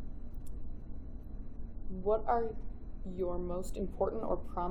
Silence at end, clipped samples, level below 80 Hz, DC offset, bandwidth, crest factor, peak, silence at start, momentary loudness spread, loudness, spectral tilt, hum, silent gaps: 0 s; under 0.1%; -42 dBFS; under 0.1%; 11.5 kHz; 16 dB; -18 dBFS; 0 s; 15 LU; -37 LUFS; -8 dB/octave; none; none